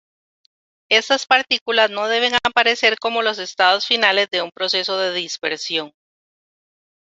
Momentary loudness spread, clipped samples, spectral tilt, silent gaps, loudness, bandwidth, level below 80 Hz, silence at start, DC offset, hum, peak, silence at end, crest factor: 8 LU; under 0.1%; -1 dB/octave; 1.61-1.66 s; -17 LUFS; 8 kHz; -64 dBFS; 0.9 s; under 0.1%; none; 0 dBFS; 1.3 s; 20 dB